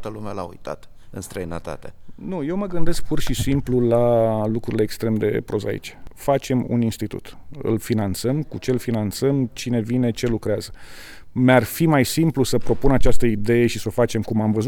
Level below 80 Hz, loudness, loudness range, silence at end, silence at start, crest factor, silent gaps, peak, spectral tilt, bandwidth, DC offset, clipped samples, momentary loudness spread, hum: -34 dBFS; -22 LUFS; 5 LU; 0 s; 0 s; 18 dB; none; -2 dBFS; -6.5 dB/octave; 18.5 kHz; under 0.1%; under 0.1%; 17 LU; none